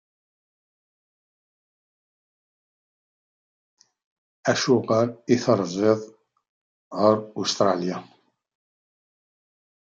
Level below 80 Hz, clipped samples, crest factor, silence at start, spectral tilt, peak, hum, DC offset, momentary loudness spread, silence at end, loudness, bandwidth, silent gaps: -74 dBFS; under 0.1%; 22 dB; 4.45 s; -5 dB/octave; -6 dBFS; none; under 0.1%; 8 LU; 1.75 s; -23 LUFS; 9 kHz; 6.49-6.91 s